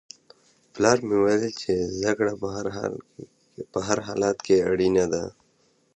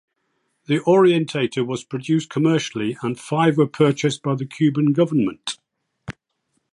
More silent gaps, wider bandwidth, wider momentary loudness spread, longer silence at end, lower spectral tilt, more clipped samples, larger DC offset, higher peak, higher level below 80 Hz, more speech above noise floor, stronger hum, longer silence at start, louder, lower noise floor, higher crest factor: neither; second, 8.8 kHz vs 11.5 kHz; second, 11 LU vs 14 LU; about the same, 0.65 s vs 0.6 s; second, -5 dB/octave vs -6.5 dB/octave; neither; neither; about the same, -2 dBFS vs -4 dBFS; first, -54 dBFS vs -62 dBFS; second, 41 dB vs 53 dB; neither; about the same, 0.75 s vs 0.7 s; second, -24 LUFS vs -20 LUFS; second, -65 dBFS vs -72 dBFS; first, 22 dB vs 16 dB